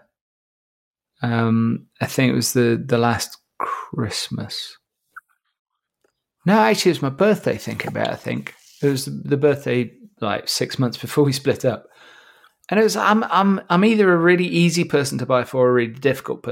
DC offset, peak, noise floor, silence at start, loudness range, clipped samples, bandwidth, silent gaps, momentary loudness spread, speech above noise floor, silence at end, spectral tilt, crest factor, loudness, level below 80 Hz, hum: under 0.1%; -2 dBFS; -70 dBFS; 1.2 s; 6 LU; under 0.1%; 17 kHz; 5.59-5.65 s; 11 LU; 51 dB; 0 s; -5.5 dB/octave; 18 dB; -20 LUFS; -62 dBFS; none